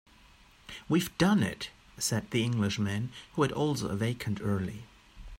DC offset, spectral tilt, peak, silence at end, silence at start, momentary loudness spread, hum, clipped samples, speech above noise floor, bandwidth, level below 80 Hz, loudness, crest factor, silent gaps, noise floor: under 0.1%; -5 dB/octave; -12 dBFS; 0 s; 0.7 s; 14 LU; none; under 0.1%; 28 dB; 16 kHz; -56 dBFS; -31 LUFS; 18 dB; none; -58 dBFS